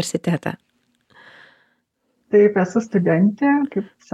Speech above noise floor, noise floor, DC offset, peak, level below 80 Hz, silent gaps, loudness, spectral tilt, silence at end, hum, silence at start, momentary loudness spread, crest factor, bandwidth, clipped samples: 51 dB; -69 dBFS; under 0.1%; -4 dBFS; -66 dBFS; none; -19 LUFS; -6.5 dB/octave; 0.3 s; none; 0 s; 12 LU; 16 dB; 13 kHz; under 0.1%